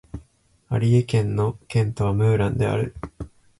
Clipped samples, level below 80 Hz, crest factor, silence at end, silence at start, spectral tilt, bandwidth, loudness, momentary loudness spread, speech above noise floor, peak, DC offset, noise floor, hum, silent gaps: under 0.1%; -44 dBFS; 16 dB; 0.3 s; 0.15 s; -8 dB/octave; 11.5 kHz; -22 LUFS; 18 LU; 37 dB; -8 dBFS; under 0.1%; -58 dBFS; none; none